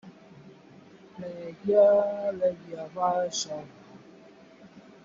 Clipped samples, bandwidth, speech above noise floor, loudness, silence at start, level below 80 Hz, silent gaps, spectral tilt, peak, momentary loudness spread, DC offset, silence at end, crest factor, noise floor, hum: under 0.1%; 7.6 kHz; 26 dB; -26 LUFS; 0.05 s; -72 dBFS; none; -4 dB/octave; -10 dBFS; 20 LU; under 0.1%; 0.25 s; 20 dB; -52 dBFS; none